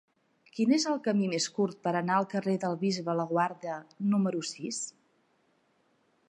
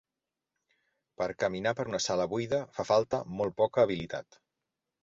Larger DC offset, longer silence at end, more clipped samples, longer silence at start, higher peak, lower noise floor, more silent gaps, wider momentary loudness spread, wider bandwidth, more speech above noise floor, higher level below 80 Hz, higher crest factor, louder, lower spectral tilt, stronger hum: neither; first, 1.4 s vs 0.8 s; neither; second, 0.55 s vs 1.2 s; about the same, -12 dBFS vs -12 dBFS; second, -71 dBFS vs -89 dBFS; neither; about the same, 9 LU vs 9 LU; first, 11 kHz vs 7.8 kHz; second, 41 dB vs 59 dB; second, -82 dBFS vs -62 dBFS; about the same, 18 dB vs 20 dB; about the same, -30 LUFS vs -31 LUFS; about the same, -5 dB/octave vs -4.5 dB/octave; neither